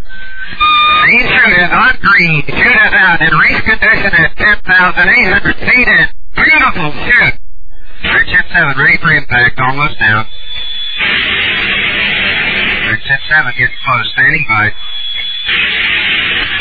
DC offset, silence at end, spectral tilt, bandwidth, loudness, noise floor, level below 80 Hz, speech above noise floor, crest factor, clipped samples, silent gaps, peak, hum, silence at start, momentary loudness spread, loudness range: 10%; 0 s; -6 dB/octave; 5 kHz; -8 LUFS; -31 dBFS; -28 dBFS; 22 dB; 10 dB; under 0.1%; none; 0 dBFS; none; 0 s; 8 LU; 4 LU